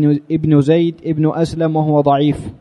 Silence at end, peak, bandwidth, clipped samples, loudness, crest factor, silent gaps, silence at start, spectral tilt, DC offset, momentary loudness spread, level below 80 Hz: 0.05 s; 0 dBFS; 10 kHz; under 0.1%; -15 LUFS; 14 dB; none; 0 s; -8.5 dB/octave; under 0.1%; 5 LU; -44 dBFS